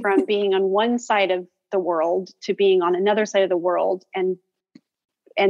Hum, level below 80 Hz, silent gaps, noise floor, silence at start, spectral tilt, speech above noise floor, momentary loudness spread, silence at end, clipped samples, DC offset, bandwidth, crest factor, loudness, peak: none; -76 dBFS; 5.05-5.09 s; -55 dBFS; 0 s; -5 dB/octave; 35 dB; 8 LU; 0 s; under 0.1%; under 0.1%; 7.6 kHz; 16 dB; -21 LUFS; -6 dBFS